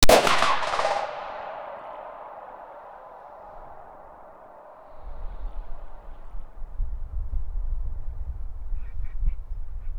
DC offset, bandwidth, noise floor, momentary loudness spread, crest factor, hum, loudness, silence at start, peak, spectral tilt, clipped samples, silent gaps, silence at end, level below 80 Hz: under 0.1%; over 20 kHz; -47 dBFS; 22 LU; 24 dB; none; -29 LUFS; 0 s; 0 dBFS; -3 dB/octave; under 0.1%; none; 0 s; -32 dBFS